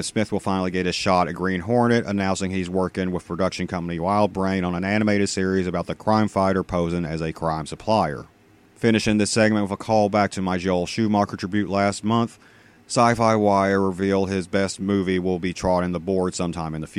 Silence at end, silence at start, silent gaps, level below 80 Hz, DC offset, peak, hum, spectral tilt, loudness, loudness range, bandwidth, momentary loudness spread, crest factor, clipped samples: 0 s; 0 s; none; -48 dBFS; under 0.1%; -2 dBFS; none; -5.5 dB/octave; -22 LUFS; 2 LU; 12 kHz; 7 LU; 20 dB; under 0.1%